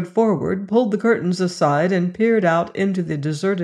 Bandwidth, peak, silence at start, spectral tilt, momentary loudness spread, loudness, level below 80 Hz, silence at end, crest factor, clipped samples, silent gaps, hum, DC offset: 11 kHz; -4 dBFS; 0 s; -7 dB/octave; 5 LU; -19 LUFS; -58 dBFS; 0 s; 16 dB; under 0.1%; none; none; under 0.1%